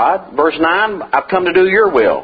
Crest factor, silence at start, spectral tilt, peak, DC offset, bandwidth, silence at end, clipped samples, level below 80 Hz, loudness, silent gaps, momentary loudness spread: 12 dB; 0 s; -7.5 dB/octave; 0 dBFS; under 0.1%; 4.9 kHz; 0 s; under 0.1%; -48 dBFS; -13 LUFS; none; 5 LU